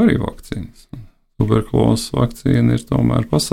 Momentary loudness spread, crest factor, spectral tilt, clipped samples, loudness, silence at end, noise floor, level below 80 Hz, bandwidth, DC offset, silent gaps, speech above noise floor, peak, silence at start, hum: 19 LU; 14 dB; -6.5 dB/octave; under 0.1%; -17 LUFS; 0 s; -37 dBFS; -34 dBFS; 15 kHz; under 0.1%; none; 21 dB; -2 dBFS; 0 s; none